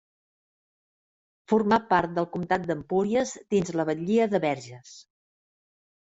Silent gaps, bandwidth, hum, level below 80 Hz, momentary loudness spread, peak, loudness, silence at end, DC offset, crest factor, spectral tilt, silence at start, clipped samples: none; 8 kHz; none; -62 dBFS; 7 LU; -6 dBFS; -26 LUFS; 1.05 s; under 0.1%; 22 dB; -6 dB/octave; 1.5 s; under 0.1%